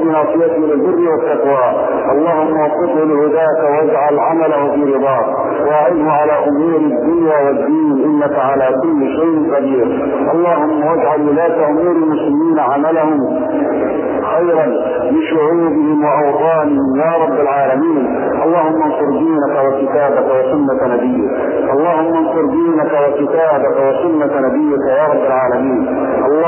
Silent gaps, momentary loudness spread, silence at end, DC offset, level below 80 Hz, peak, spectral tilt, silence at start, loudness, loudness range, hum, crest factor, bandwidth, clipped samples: none; 2 LU; 0 s; under 0.1%; -50 dBFS; 0 dBFS; -11 dB/octave; 0 s; -13 LUFS; 1 LU; none; 12 dB; 3.2 kHz; under 0.1%